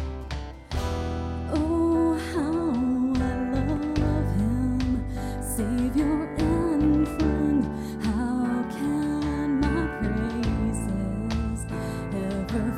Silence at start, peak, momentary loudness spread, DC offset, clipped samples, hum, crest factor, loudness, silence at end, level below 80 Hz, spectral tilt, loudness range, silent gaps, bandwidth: 0 s; -10 dBFS; 8 LU; under 0.1%; under 0.1%; none; 14 dB; -26 LUFS; 0 s; -36 dBFS; -7 dB/octave; 2 LU; none; 16 kHz